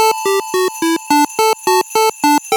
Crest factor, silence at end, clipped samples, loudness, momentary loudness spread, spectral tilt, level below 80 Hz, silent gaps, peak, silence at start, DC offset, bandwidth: 14 dB; 0 s; under 0.1%; -14 LUFS; 4 LU; -1.5 dB/octave; -68 dBFS; none; 0 dBFS; 0 s; under 0.1%; over 20 kHz